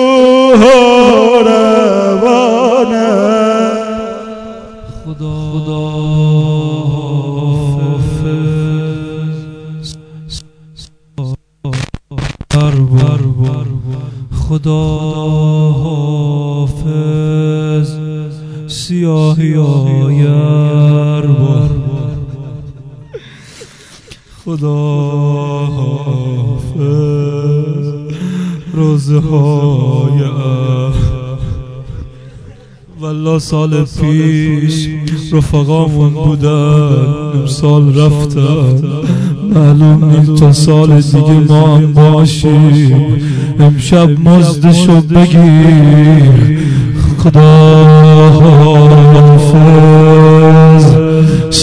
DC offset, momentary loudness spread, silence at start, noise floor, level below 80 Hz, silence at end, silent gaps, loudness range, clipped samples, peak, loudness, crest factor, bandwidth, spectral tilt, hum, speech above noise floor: under 0.1%; 17 LU; 0 s; -36 dBFS; -30 dBFS; 0 s; none; 13 LU; 5%; 0 dBFS; -8 LUFS; 8 dB; 10.5 kHz; -7.5 dB/octave; none; 31 dB